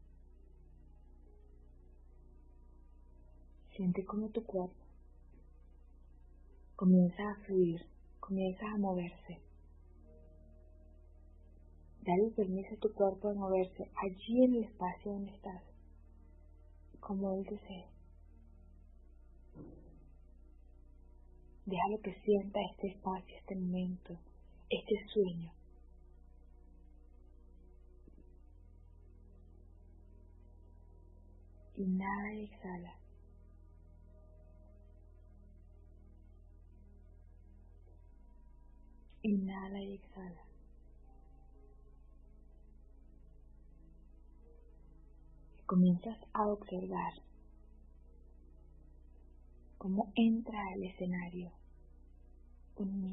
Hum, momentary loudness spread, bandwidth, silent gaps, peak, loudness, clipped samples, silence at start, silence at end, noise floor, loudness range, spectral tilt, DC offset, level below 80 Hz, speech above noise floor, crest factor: none; 22 LU; 3.5 kHz; none; -18 dBFS; -37 LUFS; under 0.1%; 1.9 s; 0 s; -58 dBFS; 14 LU; -6.5 dB/octave; under 0.1%; -58 dBFS; 23 dB; 24 dB